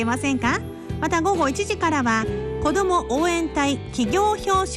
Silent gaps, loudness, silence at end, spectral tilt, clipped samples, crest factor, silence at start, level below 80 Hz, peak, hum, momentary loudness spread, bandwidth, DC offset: none; -22 LUFS; 0 s; -4.5 dB/octave; under 0.1%; 12 dB; 0 s; -38 dBFS; -10 dBFS; none; 5 LU; 13 kHz; under 0.1%